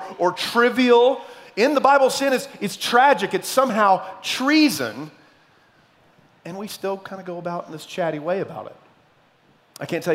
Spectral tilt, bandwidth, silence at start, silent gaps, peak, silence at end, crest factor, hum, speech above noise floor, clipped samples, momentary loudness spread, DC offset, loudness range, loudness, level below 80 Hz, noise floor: -4 dB/octave; 16 kHz; 0 s; none; -2 dBFS; 0 s; 20 dB; none; 38 dB; under 0.1%; 17 LU; under 0.1%; 12 LU; -20 LUFS; -74 dBFS; -58 dBFS